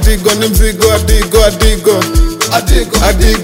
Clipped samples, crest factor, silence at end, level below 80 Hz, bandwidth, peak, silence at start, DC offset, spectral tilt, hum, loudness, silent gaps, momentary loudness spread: 0.7%; 8 dB; 0 s; -12 dBFS; 16.5 kHz; 0 dBFS; 0 s; under 0.1%; -4 dB/octave; none; -10 LUFS; none; 3 LU